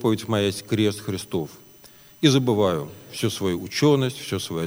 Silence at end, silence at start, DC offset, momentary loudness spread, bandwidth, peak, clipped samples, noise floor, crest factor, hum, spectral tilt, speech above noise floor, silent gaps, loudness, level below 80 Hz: 0 s; 0 s; under 0.1%; 10 LU; over 20 kHz; -4 dBFS; under 0.1%; -49 dBFS; 20 dB; none; -5.5 dB/octave; 26 dB; none; -23 LUFS; -60 dBFS